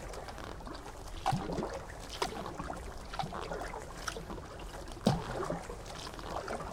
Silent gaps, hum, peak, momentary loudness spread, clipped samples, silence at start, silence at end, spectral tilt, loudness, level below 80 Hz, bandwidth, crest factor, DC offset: none; none; -10 dBFS; 11 LU; under 0.1%; 0 s; 0 s; -5 dB/octave; -40 LUFS; -48 dBFS; 17 kHz; 30 dB; under 0.1%